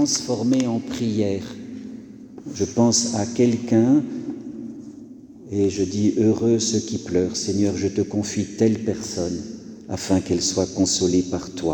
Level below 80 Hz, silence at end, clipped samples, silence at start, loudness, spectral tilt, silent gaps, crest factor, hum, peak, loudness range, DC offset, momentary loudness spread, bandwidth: -54 dBFS; 0 s; under 0.1%; 0 s; -22 LUFS; -5 dB/octave; none; 18 dB; none; -4 dBFS; 2 LU; under 0.1%; 18 LU; 18.5 kHz